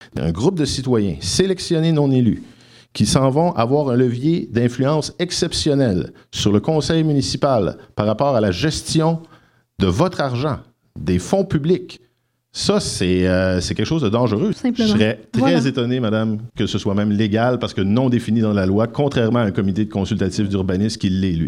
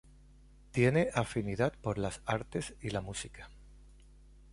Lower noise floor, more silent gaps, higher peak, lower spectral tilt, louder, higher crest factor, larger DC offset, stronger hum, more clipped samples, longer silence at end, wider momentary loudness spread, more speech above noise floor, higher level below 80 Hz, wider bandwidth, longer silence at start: first, -64 dBFS vs -58 dBFS; neither; first, 0 dBFS vs -14 dBFS; about the same, -6 dB/octave vs -6 dB/octave; first, -19 LUFS vs -34 LUFS; about the same, 18 dB vs 22 dB; neither; neither; neither; second, 0 s vs 0.6 s; second, 5 LU vs 14 LU; first, 46 dB vs 25 dB; first, -42 dBFS vs -54 dBFS; first, 13.5 kHz vs 11.5 kHz; second, 0 s vs 0.75 s